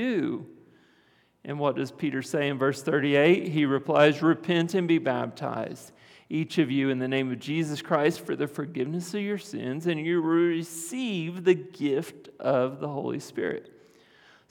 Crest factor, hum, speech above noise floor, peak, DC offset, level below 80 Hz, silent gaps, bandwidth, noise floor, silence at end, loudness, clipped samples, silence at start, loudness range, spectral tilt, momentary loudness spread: 20 dB; none; 37 dB; -6 dBFS; under 0.1%; -80 dBFS; none; 16.5 kHz; -64 dBFS; 0.8 s; -27 LUFS; under 0.1%; 0 s; 5 LU; -6 dB/octave; 11 LU